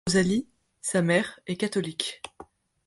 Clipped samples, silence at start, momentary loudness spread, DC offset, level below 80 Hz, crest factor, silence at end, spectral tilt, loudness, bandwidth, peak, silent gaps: under 0.1%; 0.05 s; 17 LU; under 0.1%; -60 dBFS; 18 dB; 0.45 s; -4.5 dB/octave; -27 LUFS; 11.5 kHz; -10 dBFS; none